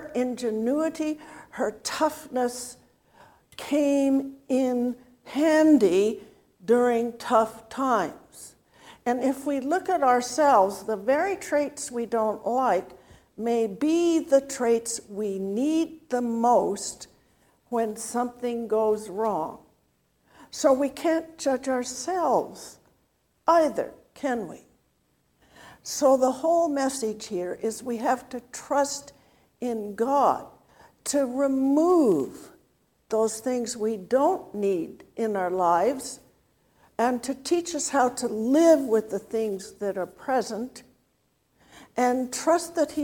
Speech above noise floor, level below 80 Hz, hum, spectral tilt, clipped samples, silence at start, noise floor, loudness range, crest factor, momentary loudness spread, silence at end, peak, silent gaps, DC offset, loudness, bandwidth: 45 dB; -66 dBFS; none; -4 dB/octave; under 0.1%; 0 s; -70 dBFS; 5 LU; 18 dB; 13 LU; 0 s; -6 dBFS; none; under 0.1%; -25 LUFS; 18 kHz